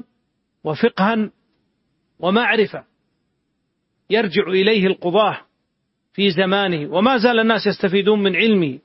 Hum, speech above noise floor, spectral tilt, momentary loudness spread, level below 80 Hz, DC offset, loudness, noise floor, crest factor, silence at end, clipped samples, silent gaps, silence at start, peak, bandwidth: none; 55 dB; -10 dB/octave; 9 LU; -62 dBFS; under 0.1%; -17 LUFS; -72 dBFS; 16 dB; 0.05 s; under 0.1%; none; 0.65 s; -2 dBFS; 5.8 kHz